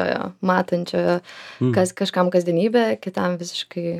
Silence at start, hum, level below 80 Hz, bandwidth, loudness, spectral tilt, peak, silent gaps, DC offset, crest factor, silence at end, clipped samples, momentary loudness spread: 0 s; none; -68 dBFS; 14.5 kHz; -21 LUFS; -6 dB/octave; -2 dBFS; none; under 0.1%; 20 dB; 0 s; under 0.1%; 7 LU